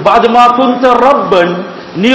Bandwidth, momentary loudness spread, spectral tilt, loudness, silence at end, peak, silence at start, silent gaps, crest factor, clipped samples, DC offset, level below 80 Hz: 8 kHz; 9 LU; -5.5 dB/octave; -8 LUFS; 0 s; 0 dBFS; 0 s; none; 8 dB; 5%; under 0.1%; -44 dBFS